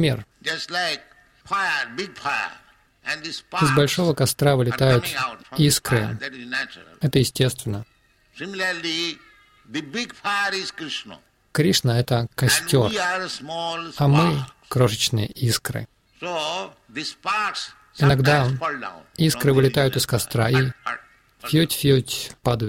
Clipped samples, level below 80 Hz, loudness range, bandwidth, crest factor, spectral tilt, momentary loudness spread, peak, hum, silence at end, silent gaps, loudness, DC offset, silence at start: under 0.1%; -50 dBFS; 6 LU; 16.5 kHz; 18 dB; -4.5 dB/octave; 13 LU; -4 dBFS; none; 0 s; none; -22 LUFS; under 0.1%; 0 s